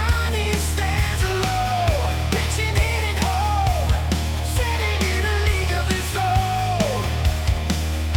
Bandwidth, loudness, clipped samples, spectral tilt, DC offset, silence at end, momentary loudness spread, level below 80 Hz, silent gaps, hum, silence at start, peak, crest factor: 18.5 kHz; -21 LUFS; under 0.1%; -4.5 dB/octave; under 0.1%; 0 s; 2 LU; -26 dBFS; none; none; 0 s; -6 dBFS; 14 dB